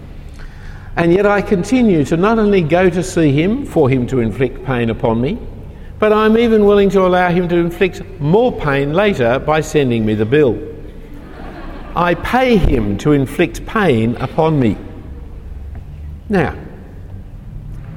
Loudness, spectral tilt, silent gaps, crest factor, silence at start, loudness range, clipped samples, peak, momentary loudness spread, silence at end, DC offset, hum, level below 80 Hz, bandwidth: -14 LUFS; -7 dB/octave; none; 14 dB; 0 s; 5 LU; under 0.1%; 0 dBFS; 22 LU; 0 s; under 0.1%; none; -30 dBFS; 16 kHz